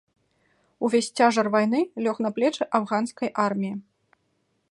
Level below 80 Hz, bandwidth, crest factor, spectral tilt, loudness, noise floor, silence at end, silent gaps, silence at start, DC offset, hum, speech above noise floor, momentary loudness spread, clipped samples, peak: -74 dBFS; 11.5 kHz; 22 dB; -5 dB/octave; -24 LUFS; -72 dBFS; 0.9 s; none; 0.8 s; under 0.1%; none; 48 dB; 9 LU; under 0.1%; -4 dBFS